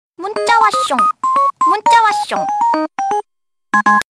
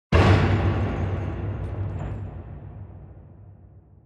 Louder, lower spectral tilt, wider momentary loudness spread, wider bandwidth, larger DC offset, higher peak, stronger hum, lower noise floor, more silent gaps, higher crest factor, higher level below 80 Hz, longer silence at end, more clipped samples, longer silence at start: first, -14 LUFS vs -24 LUFS; second, -2.5 dB/octave vs -7.5 dB/octave; second, 9 LU vs 23 LU; first, 13.5 kHz vs 8 kHz; neither; first, -2 dBFS vs -6 dBFS; neither; first, -78 dBFS vs -49 dBFS; neither; second, 12 dB vs 18 dB; second, -58 dBFS vs -34 dBFS; about the same, 0.15 s vs 0.25 s; neither; about the same, 0.2 s vs 0.1 s